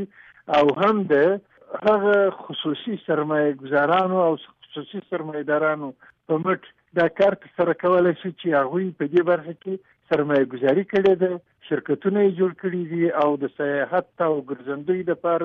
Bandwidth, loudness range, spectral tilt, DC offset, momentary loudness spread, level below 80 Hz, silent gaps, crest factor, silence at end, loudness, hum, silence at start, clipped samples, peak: 6.6 kHz; 2 LU; -8 dB/octave; under 0.1%; 11 LU; -66 dBFS; none; 14 dB; 0 s; -22 LUFS; none; 0 s; under 0.1%; -8 dBFS